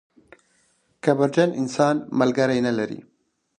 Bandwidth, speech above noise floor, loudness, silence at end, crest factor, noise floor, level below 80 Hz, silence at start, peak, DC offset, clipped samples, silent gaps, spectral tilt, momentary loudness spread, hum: 10.5 kHz; 44 dB; -22 LUFS; 0.6 s; 18 dB; -65 dBFS; -64 dBFS; 1.05 s; -4 dBFS; under 0.1%; under 0.1%; none; -6 dB/octave; 7 LU; none